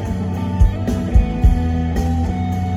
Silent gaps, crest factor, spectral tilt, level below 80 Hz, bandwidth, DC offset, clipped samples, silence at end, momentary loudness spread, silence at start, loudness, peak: none; 14 dB; -8 dB/octave; -20 dBFS; 11.5 kHz; under 0.1%; under 0.1%; 0 s; 5 LU; 0 s; -19 LUFS; -2 dBFS